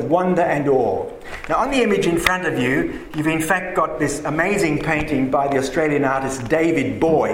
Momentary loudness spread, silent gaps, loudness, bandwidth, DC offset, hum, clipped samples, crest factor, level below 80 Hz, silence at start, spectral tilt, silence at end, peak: 5 LU; none; -19 LUFS; 16.5 kHz; under 0.1%; none; under 0.1%; 18 dB; -42 dBFS; 0 s; -5.5 dB/octave; 0 s; 0 dBFS